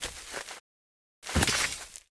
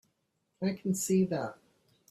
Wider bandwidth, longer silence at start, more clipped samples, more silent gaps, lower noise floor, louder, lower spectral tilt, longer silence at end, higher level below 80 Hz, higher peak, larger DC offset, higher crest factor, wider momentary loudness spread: second, 11 kHz vs 15 kHz; second, 0 s vs 0.6 s; neither; first, 0.60-1.22 s vs none; first, under -90 dBFS vs -79 dBFS; about the same, -30 LUFS vs -32 LUFS; second, -2.5 dB/octave vs -6 dB/octave; second, 0.1 s vs 0.55 s; first, -44 dBFS vs -72 dBFS; first, -10 dBFS vs -16 dBFS; neither; first, 24 dB vs 16 dB; first, 19 LU vs 8 LU